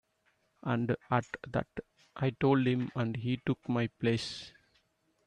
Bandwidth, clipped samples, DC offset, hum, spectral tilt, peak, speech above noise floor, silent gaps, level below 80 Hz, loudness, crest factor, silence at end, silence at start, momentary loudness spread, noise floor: 10 kHz; under 0.1%; under 0.1%; none; -7 dB/octave; -12 dBFS; 42 dB; none; -64 dBFS; -33 LUFS; 20 dB; 0.8 s; 0.65 s; 16 LU; -74 dBFS